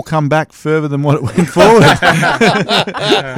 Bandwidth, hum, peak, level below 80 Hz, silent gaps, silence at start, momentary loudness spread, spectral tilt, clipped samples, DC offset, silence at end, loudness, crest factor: 17 kHz; none; 0 dBFS; -42 dBFS; none; 0.05 s; 9 LU; -5 dB/octave; under 0.1%; under 0.1%; 0 s; -11 LUFS; 10 dB